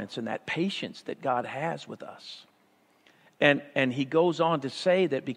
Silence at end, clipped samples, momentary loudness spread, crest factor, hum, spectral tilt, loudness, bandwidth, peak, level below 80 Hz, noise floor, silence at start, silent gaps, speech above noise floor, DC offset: 0 s; under 0.1%; 18 LU; 24 dB; none; -5.5 dB/octave; -28 LUFS; 11 kHz; -6 dBFS; -78 dBFS; -65 dBFS; 0 s; none; 37 dB; under 0.1%